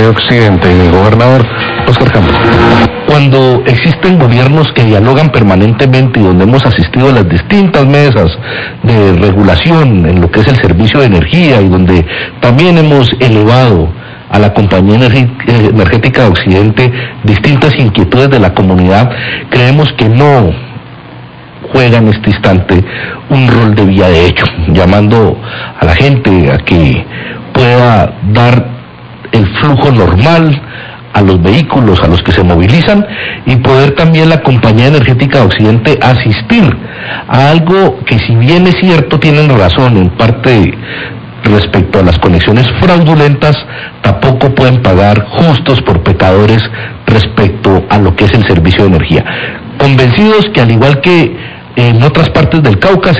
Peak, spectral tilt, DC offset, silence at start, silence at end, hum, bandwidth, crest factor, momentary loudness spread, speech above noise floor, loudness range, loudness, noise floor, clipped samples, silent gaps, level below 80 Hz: 0 dBFS; -8 dB/octave; 2%; 0 s; 0 s; none; 8 kHz; 6 dB; 7 LU; 22 dB; 2 LU; -6 LUFS; -28 dBFS; 8%; none; -22 dBFS